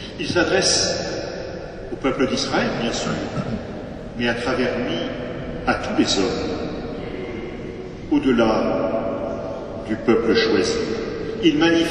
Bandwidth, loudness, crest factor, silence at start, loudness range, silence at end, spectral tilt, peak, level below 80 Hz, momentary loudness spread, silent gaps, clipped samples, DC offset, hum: 10.5 kHz; -22 LUFS; 18 dB; 0 s; 4 LU; 0 s; -4 dB/octave; -4 dBFS; -42 dBFS; 13 LU; none; under 0.1%; under 0.1%; none